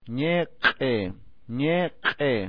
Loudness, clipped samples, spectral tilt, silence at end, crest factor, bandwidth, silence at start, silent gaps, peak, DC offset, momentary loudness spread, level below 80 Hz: -25 LUFS; under 0.1%; -8 dB/octave; 0 s; 20 dB; 5.2 kHz; 0 s; none; -6 dBFS; 0.5%; 7 LU; -56 dBFS